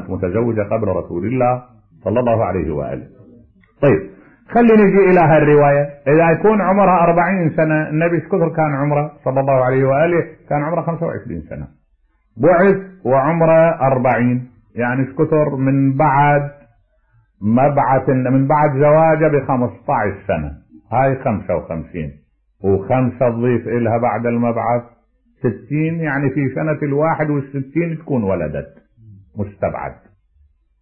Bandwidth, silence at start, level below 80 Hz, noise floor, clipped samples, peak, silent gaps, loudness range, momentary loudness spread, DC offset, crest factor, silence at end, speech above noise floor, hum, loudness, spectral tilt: 3.2 kHz; 0 s; -44 dBFS; -59 dBFS; under 0.1%; -4 dBFS; none; 7 LU; 12 LU; under 0.1%; 12 dB; 0.9 s; 44 dB; none; -16 LUFS; -12 dB/octave